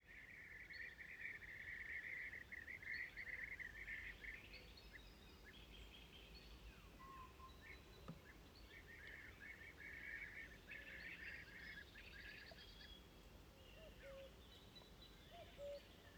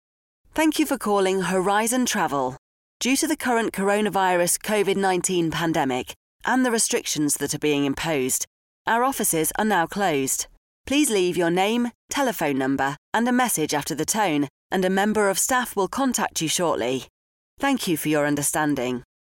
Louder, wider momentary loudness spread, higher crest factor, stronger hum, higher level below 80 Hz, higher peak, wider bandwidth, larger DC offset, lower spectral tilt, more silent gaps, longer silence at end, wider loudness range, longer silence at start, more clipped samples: second, -55 LUFS vs -23 LUFS; first, 12 LU vs 6 LU; about the same, 18 dB vs 16 dB; neither; second, -68 dBFS vs -56 dBFS; second, -40 dBFS vs -8 dBFS; first, over 20 kHz vs 17 kHz; neither; about the same, -4 dB/octave vs -3.5 dB/octave; second, none vs 2.58-3.00 s, 6.16-6.40 s, 8.47-8.85 s, 10.57-10.84 s, 11.95-12.09 s, 12.98-13.12 s, 14.50-14.70 s, 17.10-17.57 s; second, 0 s vs 0.35 s; first, 10 LU vs 1 LU; second, 0 s vs 0.55 s; neither